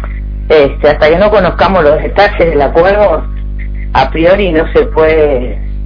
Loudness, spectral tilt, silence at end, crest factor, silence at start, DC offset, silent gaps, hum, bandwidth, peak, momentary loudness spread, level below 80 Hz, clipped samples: -9 LUFS; -8 dB/octave; 0 s; 8 dB; 0 s; under 0.1%; none; 50 Hz at -20 dBFS; 5.4 kHz; 0 dBFS; 13 LU; -18 dBFS; 1%